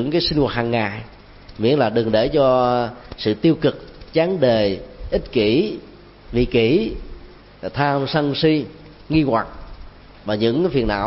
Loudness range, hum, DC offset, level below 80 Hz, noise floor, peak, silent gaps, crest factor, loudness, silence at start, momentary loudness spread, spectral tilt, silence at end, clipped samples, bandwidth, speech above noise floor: 3 LU; none; under 0.1%; -38 dBFS; -40 dBFS; -2 dBFS; none; 16 dB; -19 LUFS; 0 s; 12 LU; -10 dB/octave; 0 s; under 0.1%; 5.8 kHz; 21 dB